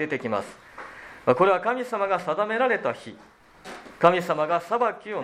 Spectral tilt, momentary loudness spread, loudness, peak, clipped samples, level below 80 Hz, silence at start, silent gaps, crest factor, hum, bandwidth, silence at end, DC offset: -6 dB/octave; 21 LU; -24 LUFS; -2 dBFS; under 0.1%; -66 dBFS; 0 s; none; 24 dB; none; 14.5 kHz; 0 s; under 0.1%